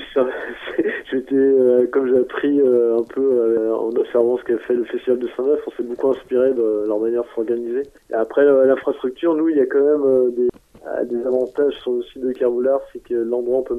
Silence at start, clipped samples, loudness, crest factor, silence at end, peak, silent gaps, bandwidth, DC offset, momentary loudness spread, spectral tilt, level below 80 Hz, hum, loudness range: 0 s; under 0.1%; -19 LUFS; 16 dB; 0 s; -4 dBFS; none; 3.8 kHz; under 0.1%; 9 LU; -7 dB/octave; -58 dBFS; none; 3 LU